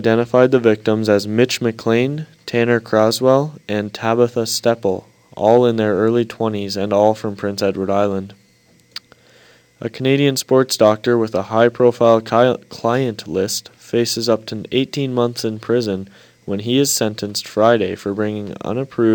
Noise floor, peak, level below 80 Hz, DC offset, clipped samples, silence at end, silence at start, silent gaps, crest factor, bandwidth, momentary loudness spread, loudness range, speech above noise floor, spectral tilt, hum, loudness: -54 dBFS; 0 dBFS; -62 dBFS; under 0.1%; under 0.1%; 0 s; 0 s; none; 18 dB; 19 kHz; 10 LU; 5 LU; 37 dB; -5 dB/octave; none; -17 LUFS